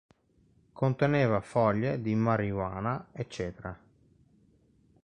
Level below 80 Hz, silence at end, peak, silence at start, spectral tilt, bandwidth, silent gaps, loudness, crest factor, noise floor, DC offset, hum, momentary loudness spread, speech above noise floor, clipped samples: -56 dBFS; 1.25 s; -12 dBFS; 0.75 s; -8 dB/octave; 10.5 kHz; none; -30 LUFS; 20 dB; -66 dBFS; under 0.1%; none; 13 LU; 37 dB; under 0.1%